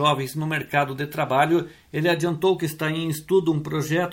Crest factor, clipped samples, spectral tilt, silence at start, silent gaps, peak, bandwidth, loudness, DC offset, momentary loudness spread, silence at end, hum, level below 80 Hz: 18 dB; under 0.1%; -5.5 dB/octave; 0 s; none; -6 dBFS; 17 kHz; -23 LUFS; under 0.1%; 6 LU; 0 s; none; -60 dBFS